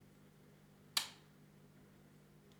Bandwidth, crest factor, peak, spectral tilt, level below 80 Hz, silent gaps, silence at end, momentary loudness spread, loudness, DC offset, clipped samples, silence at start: over 20 kHz; 32 dB; -18 dBFS; -0.5 dB/octave; -80 dBFS; none; 0 s; 25 LU; -41 LUFS; under 0.1%; under 0.1%; 0 s